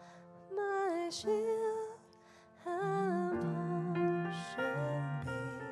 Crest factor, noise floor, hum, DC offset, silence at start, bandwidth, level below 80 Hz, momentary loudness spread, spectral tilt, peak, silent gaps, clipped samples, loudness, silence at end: 14 dB; -61 dBFS; none; under 0.1%; 0 s; 12.5 kHz; -74 dBFS; 10 LU; -6.5 dB/octave; -24 dBFS; none; under 0.1%; -37 LUFS; 0 s